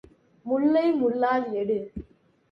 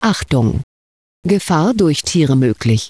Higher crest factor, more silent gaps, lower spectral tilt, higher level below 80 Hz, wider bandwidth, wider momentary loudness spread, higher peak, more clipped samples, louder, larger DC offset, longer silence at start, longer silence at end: about the same, 14 dB vs 14 dB; second, none vs 0.63-1.23 s; first, -8.5 dB/octave vs -6 dB/octave; second, -54 dBFS vs -36 dBFS; second, 5.8 kHz vs 11 kHz; first, 18 LU vs 10 LU; second, -12 dBFS vs -2 dBFS; neither; second, -25 LUFS vs -15 LUFS; second, under 0.1% vs 0.2%; first, 0.45 s vs 0 s; first, 0.5 s vs 0 s